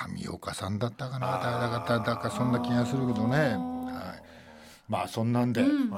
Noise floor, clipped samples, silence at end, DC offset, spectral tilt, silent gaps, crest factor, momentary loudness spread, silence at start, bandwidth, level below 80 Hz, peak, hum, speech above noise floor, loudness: -51 dBFS; under 0.1%; 0 s; under 0.1%; -6.5 dB/octave; none; 18 dB; 11 LU; 0 s; 15.5 kHz; -64 dBFS; -12 dBFS; none; 23 dB; -29 LUFS